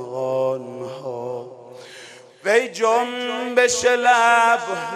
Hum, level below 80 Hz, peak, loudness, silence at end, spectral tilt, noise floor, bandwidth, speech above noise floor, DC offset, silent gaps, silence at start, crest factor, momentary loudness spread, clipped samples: none; -66 dBFS; -2 dBFS; -19 LUFS; 0 s; -2 dB/octave; -43 dBFS; 14 kHz; 25 dB; under 0.1%; none; 0 s; 18 dB; 24 LU; under 0.1%